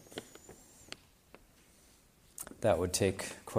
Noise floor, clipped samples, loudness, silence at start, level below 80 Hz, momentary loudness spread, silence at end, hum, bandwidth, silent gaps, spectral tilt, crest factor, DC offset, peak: -64 dBFS; under 0.1%; -33 LUFS; 0.1 s; -62 dBFS; 24 LU; 0 s; none; 15.5 kHz; none; -4.5 dB/octave; 22 dB; under 0.1%; -16 dBFS